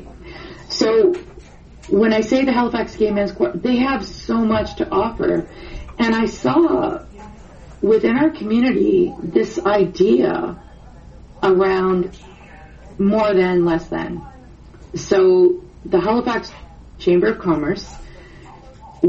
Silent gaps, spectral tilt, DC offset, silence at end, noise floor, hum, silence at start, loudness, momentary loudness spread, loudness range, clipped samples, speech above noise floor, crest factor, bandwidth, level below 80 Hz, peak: none; -6.5 dB/octave; under 0.1%; 0 s; -41 dBFS; none; 0 s; -18 LUFS; 14 LU; 2 LU; under 0.1%; 24 dB; 16 dB; 7.6 kHz; -42 dBFS; -2 dBFS